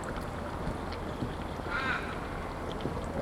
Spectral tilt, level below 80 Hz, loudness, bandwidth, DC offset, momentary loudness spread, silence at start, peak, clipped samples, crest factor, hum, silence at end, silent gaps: -6 dB/octave; -44 dBFS; -36 LUFS; 16.5 kHz; under 0.1%; 6 LU; 0 s; -18 dBFS; under 0.1%; 16 dB; none; 0 s; none